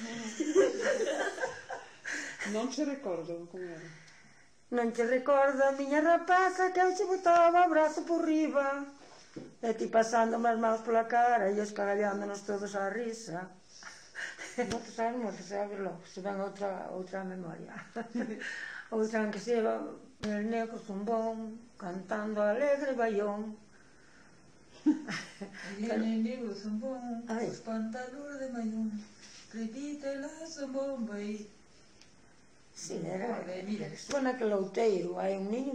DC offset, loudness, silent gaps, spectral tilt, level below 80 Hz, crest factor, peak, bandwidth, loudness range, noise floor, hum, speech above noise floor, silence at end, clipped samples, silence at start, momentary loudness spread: under 0.1%; -32 LUFS; none; -5 dB/octave; -72 dBFS; 18 dB; -16 dBFS; 10 kHz; 11 LU; -63 dBFS; none; 31 dB; 0 s; under 0.1%; 0 s; 16 LU